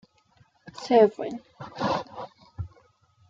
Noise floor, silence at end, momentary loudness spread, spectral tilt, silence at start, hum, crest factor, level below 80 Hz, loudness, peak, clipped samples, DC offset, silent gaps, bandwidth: -63 dBFS; 0.65 s; 23 LU; -6.5 dB/octave; 0.65 s; none; 22 dB; -58 dBFS; -24 LUFS; -6 dBFS; under 0.1%; under 0.1%; none; 7.6 kHz